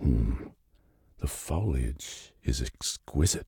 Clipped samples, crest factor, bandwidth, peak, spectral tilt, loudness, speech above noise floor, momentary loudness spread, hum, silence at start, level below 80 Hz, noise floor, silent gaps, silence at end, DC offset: under 0.1%; 16 dB; 17.5 kHz; -14 dBFS; -5 dB/octave; -32 LUFS; 34 dB; 11 LU; none; 0 s; -34 dBFS; -64 dBFS; none; 0.05 s; under 0.1%